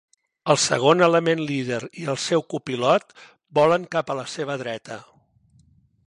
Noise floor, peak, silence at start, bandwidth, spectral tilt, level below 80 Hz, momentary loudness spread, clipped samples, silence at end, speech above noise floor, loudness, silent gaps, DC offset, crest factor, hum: -59 dBFS; -4 dBFS; 0.45 s; 11.5 kHz; -4 dB/octave; -66 dBFS; 13 LU; under 0.1%; 1.05 s; 37 dB; -22 LUFS; none; under 0.1%; 20 dB; none